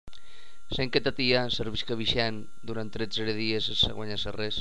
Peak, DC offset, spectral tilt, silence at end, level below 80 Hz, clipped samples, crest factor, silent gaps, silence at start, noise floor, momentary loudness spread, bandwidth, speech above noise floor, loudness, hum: -10 dBFS; 3%; -5 dB/octave; 0 s; -48 dBFS; under 0.1%; 22 dB; none; 0.35 s; -56 dBFS; 11 LU; 11 kHz; 26 dB; -28 LUFS; none